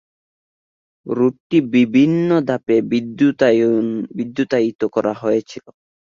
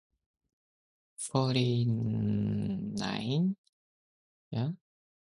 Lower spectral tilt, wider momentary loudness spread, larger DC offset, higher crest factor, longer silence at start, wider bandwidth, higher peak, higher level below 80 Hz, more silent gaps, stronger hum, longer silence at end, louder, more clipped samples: about the same, -7.5 dB/octave vs -6.5 dB/octave; about the same, 10 LU vs 11 LU; neither; about the same, 16 dB vs 20 dB; second, 1.05 s vs 1.2 s; second, 7.4 kHz vs 11.5 kHz; first, -2 dBFS vs -14 dBFS; about the same, -60 dBFS vs -62 dBFS; second, 1.40-1.50 s, 4.75-4.79 s vs 3.58-4.51 s; neither; about the same, 0.55 s vs 0.5 s; first, -17 LUFS vs -32 LUFS; neither